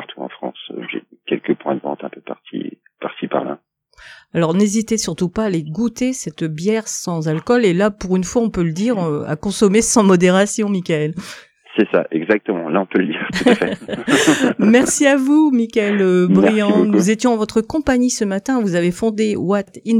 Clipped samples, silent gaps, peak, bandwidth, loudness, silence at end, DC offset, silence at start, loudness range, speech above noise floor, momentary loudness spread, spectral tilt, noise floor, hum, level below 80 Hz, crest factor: under 0.1%; none; 0 dBFS; 15.5 kHz; -17 LUFS; 0 s; under 0.1%; 0 s; 9 LU; 32 dB; 16 LU; -5 dB/octave; -48 dBFS; none; -48 dBFS; 16 dB